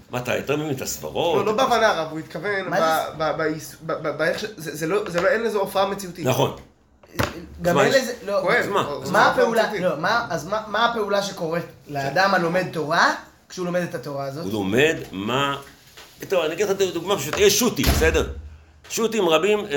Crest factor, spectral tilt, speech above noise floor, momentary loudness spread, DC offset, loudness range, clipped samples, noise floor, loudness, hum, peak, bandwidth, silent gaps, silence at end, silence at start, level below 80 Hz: 20 dB; -4 dB/octave; 21 dB; 11 LU; under 0.1%; 3 LU; under 0.1%; -43 dBFS; -22 LUFS; none; -2 dBFS; 17 kHz; none; 0 s; 0.1 s; -40 dBFS